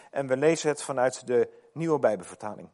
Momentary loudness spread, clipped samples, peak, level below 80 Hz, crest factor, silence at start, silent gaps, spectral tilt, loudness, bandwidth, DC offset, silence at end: 10 LU; under 0.1%; -10 dBFS; -76 dBFS; 16 dB; 0.15 s; none; -5 dB/octave; -27 LUFS; 11.5 kHz; under 0.1%; 0.1 s